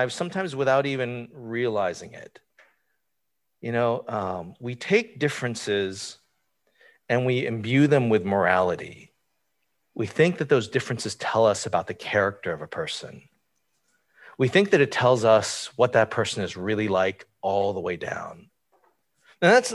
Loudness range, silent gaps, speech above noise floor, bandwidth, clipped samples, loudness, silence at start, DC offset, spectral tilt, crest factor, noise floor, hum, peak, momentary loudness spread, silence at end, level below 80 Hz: 6 LU; none; 57 dB; 12.5 kHz; under 0.1%; -24 LUFS; 0 s; under 0.1%; -5 dB/octave; 20 dB; -81 dBFS; none; -4 dBFS; 14 LU; 0 s; -58 dBFS